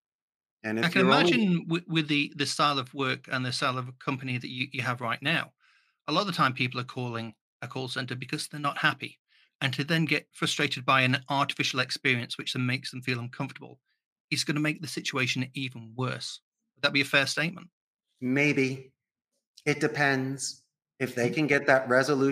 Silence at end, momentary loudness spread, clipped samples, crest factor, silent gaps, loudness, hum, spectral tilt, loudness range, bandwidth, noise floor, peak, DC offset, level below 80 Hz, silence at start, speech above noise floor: 0 s; 13 LU; under 0.1%; 24 dB; 7.41-7.60 s, 9.19-9.25 s, 9.55-9.59 s, 14.06-14.28 s, 16.42-16.52 s, 17.73-17.99 s, 19.47-19.54 s; -28 LUFS; none; -4.5 dB/octave; 5 LU; 15 kHz; -84 dBFS; -6 dBFS; under 0.1%; -74 dBFS; 0.65 s; 56 dB